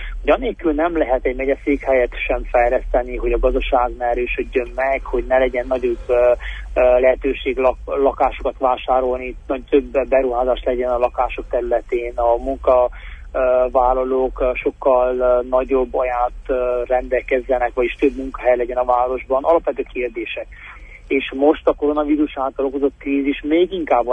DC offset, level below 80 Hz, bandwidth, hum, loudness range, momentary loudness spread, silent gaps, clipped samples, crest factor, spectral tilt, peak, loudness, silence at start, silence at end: under 0.1%; -32 dBFS; 3.8 kHz; none; 2 LU; 6 LU; none; under 0.1%; 16 dB; -7.5 dB/octave; -2 dBFS; -19 LUFS; 0 s; 0 s